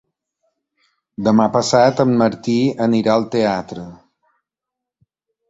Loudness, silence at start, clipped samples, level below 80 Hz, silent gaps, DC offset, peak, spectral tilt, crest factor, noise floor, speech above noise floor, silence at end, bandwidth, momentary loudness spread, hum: -16 LUFS; 1.2 s; under 0.1%; -56 dBFS; none; under 0.1%; -2 dBFS; -6 dB/octave; 18 dB; -84 dBFS; 68 dB; 1.55 s; 7.8 kHz; 18 LU; none